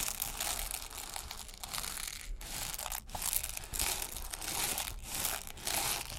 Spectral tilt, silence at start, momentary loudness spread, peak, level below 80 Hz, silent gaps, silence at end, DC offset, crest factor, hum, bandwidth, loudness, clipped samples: -0.5 dB/octave; 0 s; 8 LU; -8 dBFS; -48 dBFS; none; 0 s; under 0.1%; 30 dB; none; 17 kHz; -36 LUFS; under 0.1%